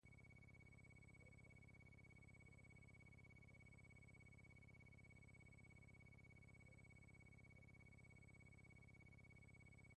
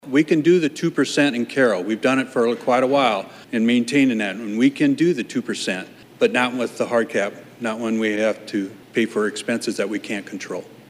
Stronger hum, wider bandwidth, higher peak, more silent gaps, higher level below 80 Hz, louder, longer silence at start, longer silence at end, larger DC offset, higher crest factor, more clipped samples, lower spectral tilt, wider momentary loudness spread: first, 50 Hz at -75 dBFS vs none; second, 9.6 kHz vs 15 kHz; second, -56 dBFS vs -4 dBFS; neither; about the same, -74 dBFS vs -74 dBFS; second, -67 LUFS vs -21 LUFS; about the same, 0.05 s vs 0.05 s; second, 0 s vs 0.2 s; neither; second, 10 dB vs 16 dB; neither; about the same, -6 dB/octave vs -5 dB/octave; second, 0 LU vs 10 LU